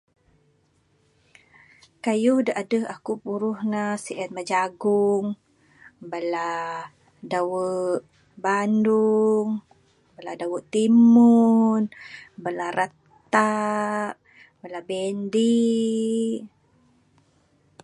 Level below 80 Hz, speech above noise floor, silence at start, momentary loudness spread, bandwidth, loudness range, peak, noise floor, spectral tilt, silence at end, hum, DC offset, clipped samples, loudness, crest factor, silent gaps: -72 dBFS; 43 dB; 2.05 s; 15 LU; 11 kHz; 7 LU; -2 dBFS; -65 dBFS; -6 dB/octave; 1.35 s; none; under 0.1%; under 0.1%; -23 LUFS; 20 dB; none